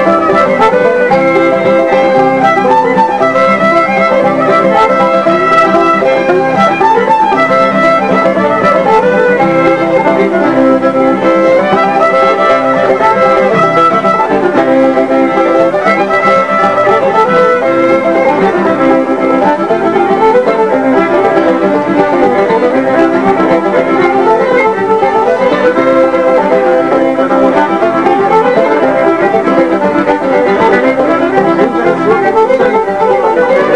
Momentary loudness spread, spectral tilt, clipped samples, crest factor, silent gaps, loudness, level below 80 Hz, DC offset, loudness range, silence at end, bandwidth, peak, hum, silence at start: 2 LU; -6.5 dB/octave; 0.7%; 8 dB; none; -8 LUFS; -46 dBFS; 0.8%; 1 LU; 0 s; 10.5 kHz; 0 dBFS; none; 0 s